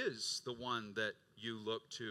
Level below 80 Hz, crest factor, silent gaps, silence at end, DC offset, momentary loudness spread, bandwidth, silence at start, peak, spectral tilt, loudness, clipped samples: -82 dBFS; 18 dB; none; 0 s; under 0.1%; 6 LU; 15.5 kHz; 0 s; -26 dBFS; -2.5 dB/octave; -42 LUFS; under 0.1%